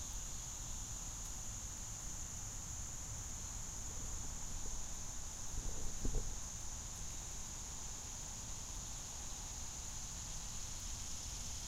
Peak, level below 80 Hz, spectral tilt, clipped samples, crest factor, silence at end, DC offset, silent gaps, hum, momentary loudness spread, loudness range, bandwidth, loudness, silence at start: -26 dBFS; -48 dBFS; -2 dB/octave; under 0.1%; 18 dB; 0 s; under 0.1%; none; none; 1 LU; 1 LU; 16 kHz; -45 LUFS; 0 s